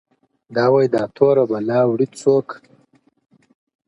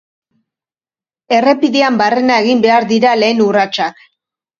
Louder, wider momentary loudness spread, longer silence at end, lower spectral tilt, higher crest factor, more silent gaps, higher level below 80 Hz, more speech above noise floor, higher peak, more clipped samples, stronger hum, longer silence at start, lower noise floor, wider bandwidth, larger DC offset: second, -17 LUFS vs -12 LUFS; first, 9 LU vs 5 LU; first, 1.3 s vs 0.65 s; first, -7 dB/octave vs -4.5 dB/octave; about the same, 18 dB vs 14 dB; neither; second, -66 dBFS vs -60 dBFS; second, 41 dB vs over 79 dB; about the same, -2 dBFS vs 0 dBFS; neither; neither; second, 0.5 s vs 1.3 s; second, -58 dBFS vs under -90 dBFS; first, 11 kHz vs 7.4 kHz; neither